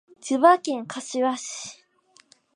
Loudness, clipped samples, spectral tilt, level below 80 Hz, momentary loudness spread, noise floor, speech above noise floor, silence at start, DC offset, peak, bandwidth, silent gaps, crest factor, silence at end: -23 LUFS; under 0.1%; -2.5 dB/octave; -82 dBFS; 17 LU; -60 dBFS; 37 dB; 0.25 s; under 0.1%; -4 dBFS; 11 kHz; none; 22 dB; 0.8 s